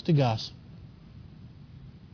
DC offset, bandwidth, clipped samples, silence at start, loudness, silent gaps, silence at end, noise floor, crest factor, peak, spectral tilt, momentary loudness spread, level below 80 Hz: under 0.1%; 5.4 kHz; under 0.1%; 0.05 s; -28 LUFS; none; 0.15 s; -48 dBFS; 18 dB; -14 dBFS; -7.5 dB/octave; 24 LU; -56 dBFS